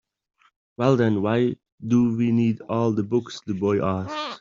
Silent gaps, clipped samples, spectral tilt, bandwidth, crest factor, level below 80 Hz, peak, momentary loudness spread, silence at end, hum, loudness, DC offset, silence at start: 1.72-1.78 s; under 0.1%; -7.5 dB/octave; 7.4 kHz; 18 dB; -60 dBFS; -6 dBFS; 7 LU; 0.05 s; none; -23 LUFS; under 0.1%; 0.8 s